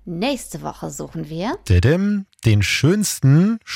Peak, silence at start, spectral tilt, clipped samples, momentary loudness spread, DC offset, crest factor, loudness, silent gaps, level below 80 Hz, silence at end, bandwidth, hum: -4 dBFS; 0.05 s; -5.5 dB/octave; under 0.1%; 14 LU; under 0.1%; 14 dB; -18 LUFS; none; -42 dBFS; 0 s; 16.5 kHz; none